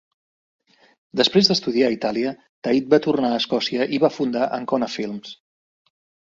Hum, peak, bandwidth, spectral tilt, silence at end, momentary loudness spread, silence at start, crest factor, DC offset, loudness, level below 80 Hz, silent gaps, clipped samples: none; -2 dBFS; 7.6 kHz; -5 dB/octave; 0.85 s; 12 LU; 1.15 s; 20 dB; under 0.1%; -21 LUFS; -62 dBFS; 2.49-2.62 s; under 0.1%